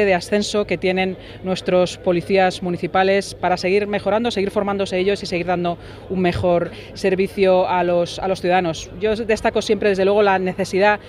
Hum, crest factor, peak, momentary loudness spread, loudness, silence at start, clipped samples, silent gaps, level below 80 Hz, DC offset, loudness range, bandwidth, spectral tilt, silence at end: none; 18 dB; -2 dBFS; 7 LU; -19 LUFS; 0 s; under 0.1%; none; -44 dBFS; under 0.1%; 2 LU; 13 kHz; -5.5 dB/octave; 0 s